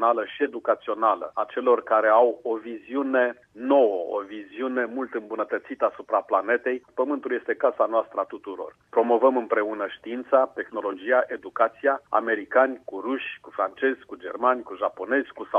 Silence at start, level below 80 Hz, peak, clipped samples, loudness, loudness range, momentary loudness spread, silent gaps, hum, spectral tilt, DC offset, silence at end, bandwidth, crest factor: 0 s; -74 dBFS; -6 dBFS; under 0.1%; -25 LUFS; 3 LU; 11 LU; none; none; -6 dB/octave; under 0.1%; 0 s; 4.6 kHz; 18 dB